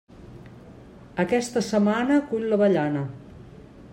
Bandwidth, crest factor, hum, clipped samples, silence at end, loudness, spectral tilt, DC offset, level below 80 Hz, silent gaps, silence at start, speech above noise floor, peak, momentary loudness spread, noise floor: 15 kHz; 16 dB; none; under 0.1%; 0 s; -23 LUFS; -6 dB/octave; under 0.1%; -56 dBFS; none; 0.2 s; 23 dB; -8 dBFS; 24 LU; -46 dBFS